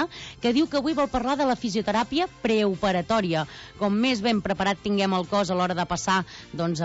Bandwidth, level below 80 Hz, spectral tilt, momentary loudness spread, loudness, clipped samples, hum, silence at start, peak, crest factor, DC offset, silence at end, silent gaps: 8 kHz; -50 dBFS; -5 dB/octave; 6 LU; -25 LUFS; under 0.1%; none; 0 s; -12 dBFS; 12 dB; under 0.1%; 0 s; none